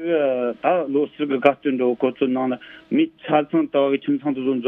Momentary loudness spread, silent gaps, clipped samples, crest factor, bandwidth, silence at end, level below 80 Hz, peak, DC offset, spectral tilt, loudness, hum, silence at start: 4 LU; none; under 0.1%; 20 dB; 3.9 kHz; 0 s; -68 dBFS; 0 dBFS; under 0.1%; -8.5 dB/octave; -21 LUFS; none; 0 s